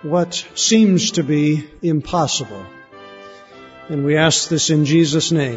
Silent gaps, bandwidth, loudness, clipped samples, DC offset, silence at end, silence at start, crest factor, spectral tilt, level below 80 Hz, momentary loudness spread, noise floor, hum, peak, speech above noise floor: none; 8 kHz; -16 LUFS; under 0.1%; under 0.1%; 0 s; 0 s; 16 dB; -4.5 dB/octave; -50 dBFS; 9 LU; -40 dBFS; none; -2 dBFS; 24 dB